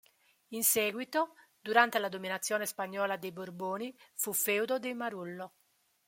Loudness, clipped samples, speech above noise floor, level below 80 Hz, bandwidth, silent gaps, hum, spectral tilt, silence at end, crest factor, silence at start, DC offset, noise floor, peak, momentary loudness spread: -32 LUFS; under 0.1%; 40 dB; -82 dBFS; 16.5 kHz; none; none; -2 dB/octave; 0.6 s; 26 dB; 0.5 s; under 0.1%; -73 dBFS; -10 dBFS; 15 LU